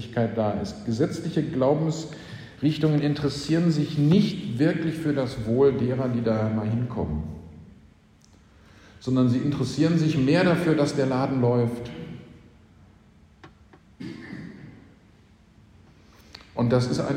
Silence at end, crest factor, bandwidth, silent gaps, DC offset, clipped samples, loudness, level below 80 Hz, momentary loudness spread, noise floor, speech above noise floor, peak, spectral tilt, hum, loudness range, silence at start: 0 s; 18 dB; 10.5 kHz; none; under 0.1%; under 0.1%; -24 LUFS; -50 dBFS; 18 LU; -55 dBFS; 32 dB; -8 dBFS; -7.5 dB/octave; none; 21 LU; 0 s